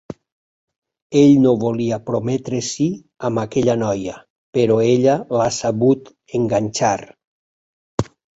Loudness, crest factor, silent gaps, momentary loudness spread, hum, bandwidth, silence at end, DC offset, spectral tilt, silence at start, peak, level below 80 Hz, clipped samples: -18 LUFS; 18 dB; 0.32-0.68 s, 0.78-0.82 s, 1.02-1.10 s, 4.30-4.53 s, 7.27-7.98 s; 12 LU; none; 8 kHz; 0.35 s; under 0.1%; -6 dB/octave; 0.1 s; -2 dBFS; -52 dBFS; under 0.1%